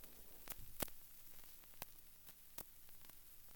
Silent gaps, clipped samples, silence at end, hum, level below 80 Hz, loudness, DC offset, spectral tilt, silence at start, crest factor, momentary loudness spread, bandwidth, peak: none; under 0.1%; 0 s; 60 Hz at -80 dBFS; -66 dBFS; -54 LUFS; under 0.1%; -2.5 dB/octave; 0 s; 30 dB; 11 LU; 19.5 kHz; -24 dBFS